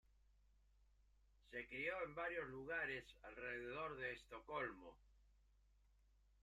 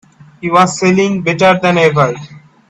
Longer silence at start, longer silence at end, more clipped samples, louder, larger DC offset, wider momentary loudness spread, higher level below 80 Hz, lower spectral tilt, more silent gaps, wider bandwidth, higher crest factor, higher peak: first, 0.8 s vs 0.4 s; first, 1.1 s vs 0.3 s; neither; second, -49 LUFS vs -11 LUFS; neither; first, 9 LU vs 6 LU; second, -72 dBFS vs -52 dBFS; about the same, -5.5 dB/octave vs -5.5 dB/octave; neither; first, 13.5 kHz vs 9.8 kHz; first, 18 dB vs 12 dB; second, -34 dBFS vs 0 dBFS